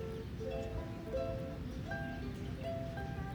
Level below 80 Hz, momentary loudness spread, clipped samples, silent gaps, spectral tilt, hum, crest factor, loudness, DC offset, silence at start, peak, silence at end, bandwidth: -48 dBFS; 3 LU; under 0.1%; none; -7 dB/octave; none; 14 dB; -42 LUFS; under 0.1%; 0 s; -28 dBFS; 0 s; over 20 kHz